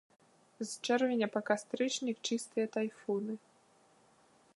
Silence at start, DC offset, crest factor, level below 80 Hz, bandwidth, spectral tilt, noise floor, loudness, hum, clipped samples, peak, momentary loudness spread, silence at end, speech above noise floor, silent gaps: 0.6 s; under 0.1%; 22 dB; -88 dBFS; 11.5 kHz; -3.5 dB/octave; -67 dBFS; -35 LUFS; none; under 0.1%; -16 dBFS; 11 LU; 1.2 s; 32 dB; none